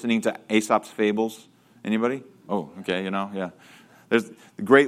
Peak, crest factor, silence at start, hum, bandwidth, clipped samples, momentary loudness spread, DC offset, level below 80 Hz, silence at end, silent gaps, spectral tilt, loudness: -2 dBFS; 22 dB; 0 s; none; 15.5 kHz; under 0.1%; 13 LU; under 0.1%; -72 dBFS; 0 s; none; -5 dB/octave; -26 LUFS